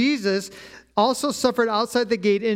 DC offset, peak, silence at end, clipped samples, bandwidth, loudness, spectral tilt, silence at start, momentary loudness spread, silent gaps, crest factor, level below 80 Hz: under 0.1%; -6 dBFS; 0 s; under 0.1%; 16.5 kHz; -22 LUFS; -4 dB/octave; 0 s; 7 LU; none; 16 dB; -60 dBFS